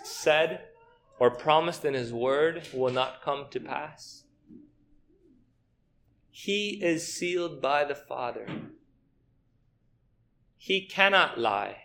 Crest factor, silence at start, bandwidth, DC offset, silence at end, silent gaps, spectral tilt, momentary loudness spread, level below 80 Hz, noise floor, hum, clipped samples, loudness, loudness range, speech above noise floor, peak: 24 dB; 0 s; 18 kHz; under 0.1%; 0.05 s; none; -3.5 dB/octave; 16 LU; -68 dBFS; -69 dBFS; none; under 0.1%; -27 LUFS; 9 LU; 41 dB; -6 dBFS